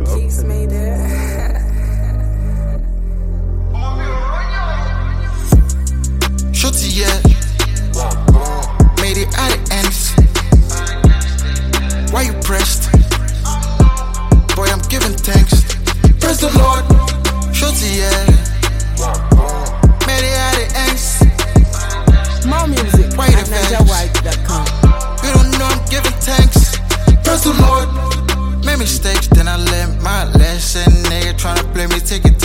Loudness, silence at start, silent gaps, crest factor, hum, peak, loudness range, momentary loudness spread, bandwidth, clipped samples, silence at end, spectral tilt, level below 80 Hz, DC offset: -14 LUFS; 0 s; none; 12 dB; none; 0 dBFS; 5 LU; 8 LU; 16.5 kHz; under 0.1%; 0 s; -4.5 dB/octave; -14 dBFS; under 0.1%